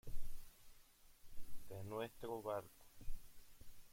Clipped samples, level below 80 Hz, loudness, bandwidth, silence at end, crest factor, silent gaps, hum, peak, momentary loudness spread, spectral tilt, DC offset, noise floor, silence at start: under 0.1%; -54 dBFS; -51 LUFS; 16.5 kHz; 0.05 s; 14 dB; none; none; -28 dBFS; 21 LU; -5.5 dB/octave; under 0.1%; -66 dBFS; 0.05 s